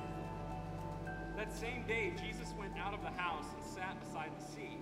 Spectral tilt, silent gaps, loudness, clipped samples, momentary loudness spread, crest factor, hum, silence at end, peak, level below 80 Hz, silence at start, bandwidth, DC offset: -5 dB/octave; none; -43 LUFS; under 0.1%; 7 LU; 18 dB; none; 0 s; -24 dBFS; -54 dBFS; 0 s; 16 kHz; under 0.1%